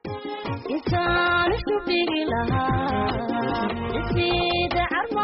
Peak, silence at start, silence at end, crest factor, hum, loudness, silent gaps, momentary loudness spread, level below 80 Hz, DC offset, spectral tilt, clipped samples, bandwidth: -12 dBFS; 0.05 s; 0 s; 10 dB; none; -24 LUFS; none; 8 LU; -40 dBFS; under 0.1%; -3.5 dB/octave; under 0.1%; 5.8 kHz